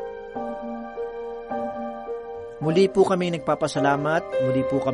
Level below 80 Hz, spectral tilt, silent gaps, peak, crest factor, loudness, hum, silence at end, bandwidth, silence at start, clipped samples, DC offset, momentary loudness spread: -54 dBFS; -6.5 dB/octave; none; -6 dBFS; 18 dB; -25 LUFS; none; 0 s; 11.5 kHz; 0 s; under 0.1%; under 0.1%; 13 LU